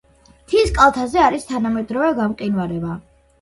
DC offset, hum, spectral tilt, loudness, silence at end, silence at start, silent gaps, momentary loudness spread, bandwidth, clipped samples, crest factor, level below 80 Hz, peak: under 0.1%; none; -5.5 dB/octave; -18 LUFS; 0.4 s; 0.5 s; none; 11 LU; 11.5 kHz; under 0.1%; 18 dB; -36 dBFS; 0 dBFS